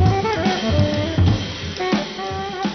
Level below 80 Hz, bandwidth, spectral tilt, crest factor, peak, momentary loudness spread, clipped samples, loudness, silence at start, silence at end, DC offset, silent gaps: -34 dBFS; 6.4 kHz; -6 dB/octave; 16 dB; -4 dBFS; 8 LU; under 0.1%; -20 LUFS; 0 s; 0 s; under 0.1%; none